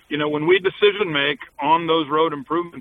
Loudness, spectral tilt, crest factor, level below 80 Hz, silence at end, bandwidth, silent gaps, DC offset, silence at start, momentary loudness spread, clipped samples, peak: -20 LUFS; -7.5 dB/octave; 16 dB; -62 dBFS; 0 s; 4.2 kHz; none; under 0.1%; 0.1 s; 7 LU; under 0.1%; -4 dBFS